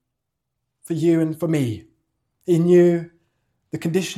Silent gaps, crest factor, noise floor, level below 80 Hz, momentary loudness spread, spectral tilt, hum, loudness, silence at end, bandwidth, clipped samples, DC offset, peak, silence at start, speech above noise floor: none; 16 dB; -80 dBFS; -66 dBFS; 20 LU; -7 dB/octave; none; -20 LUFS; 0 s; 14 kHz; under 0.1%; under 0.1%; -6 dBFS; 0.9 s; 62 dB